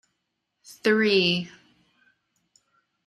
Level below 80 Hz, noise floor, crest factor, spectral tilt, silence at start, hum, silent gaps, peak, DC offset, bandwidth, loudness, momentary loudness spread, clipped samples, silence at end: -72 dBFS; -79 dBFS; 20 dB; -5 dB/octave; 0.7 s; none; none; -8 dBFS; under 0.1%; 13 kHz; -22 LUFS; 10 LU; under 0.1%; 1.6 s